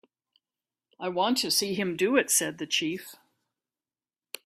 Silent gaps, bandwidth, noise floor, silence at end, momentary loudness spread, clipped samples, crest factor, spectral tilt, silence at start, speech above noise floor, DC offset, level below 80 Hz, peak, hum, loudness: none; 15.5 kHz; under -90 dBFS; 1.3 s; 15 LU; under 0.1%; 22 dB; -2 dB/octave; 1 s; over 63 dB; under 0.1%; -74 dBFS; -8 dBFS; none; -26 LUFS